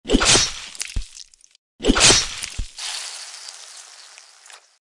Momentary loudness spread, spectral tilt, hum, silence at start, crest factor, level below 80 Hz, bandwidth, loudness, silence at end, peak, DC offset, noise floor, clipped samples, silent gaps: 25 LU; -1.5 dB/octave; none; 0.05 s; 22 dB; -34 dBFS; 11.5 kHz; -18 LUFS; 0.3 s; 0 dBFS; under 0.1%; -47 dBFS; under 0.1%; 1.58-1.79 s